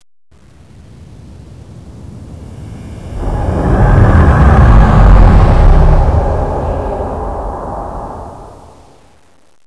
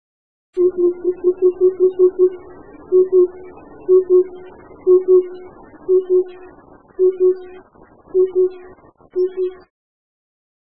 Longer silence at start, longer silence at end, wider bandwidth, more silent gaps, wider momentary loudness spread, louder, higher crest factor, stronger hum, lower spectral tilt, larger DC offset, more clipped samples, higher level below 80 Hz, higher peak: first, 1 s vs 0.55 s; about the same, 1.15 s vs 1.1 s; first, 7.4 kHz vs 2.6 kHz; neither; first, 23 LU vs 15 LU; first, -11 LUFS vs -17 LUFS; about the same, 10 dB vs 14 dB; neither; second, -9 dB/octave vs -10.5 dB/octave; second, under 0.1% vs 0.6%; first, 2% vs under 0.1%; first, -12 dBFS vs -58 dBFS; first, 0 dBFS vs -4 dBFS